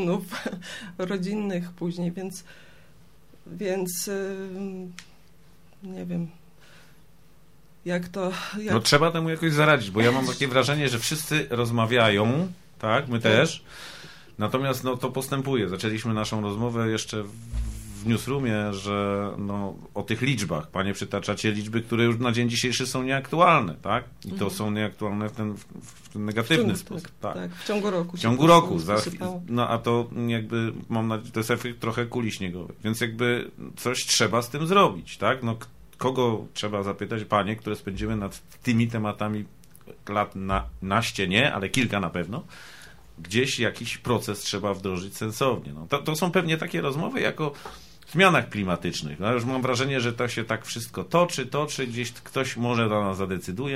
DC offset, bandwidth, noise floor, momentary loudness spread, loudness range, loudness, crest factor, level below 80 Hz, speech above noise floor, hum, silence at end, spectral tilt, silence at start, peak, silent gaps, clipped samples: 0.3%; 16 kHz; -57 dBFS; 14 LU; 9 LU; -26 LUFS; 22 dB; -50 dBFS; 32 dB; none; 0 s; -5 dB/octave; 0 s; -4 dBFS; none; under 0.1%